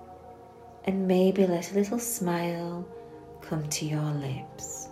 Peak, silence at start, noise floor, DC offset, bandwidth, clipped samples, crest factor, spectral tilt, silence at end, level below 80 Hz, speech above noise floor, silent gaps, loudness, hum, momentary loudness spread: -12 dBFS; 0 s; -49 dBFS; under 0.1%; 16 kHz; under 0.1%; 18 dB; -5.5 dB/octave; 0 s; -62 dBFS; 21 dB; none; -29 LUFS; none; 23 LU